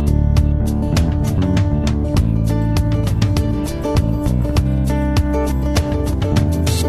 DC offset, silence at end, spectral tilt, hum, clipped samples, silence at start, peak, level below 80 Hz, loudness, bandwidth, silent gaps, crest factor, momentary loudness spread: under 0.1%; 0 s; -7 dB/octave; none; under 0.1%; 0 s; -2 dBFS; -20 dBFS; -17 LUFS; 13.5 kHz; none; 14 dB; 2 LU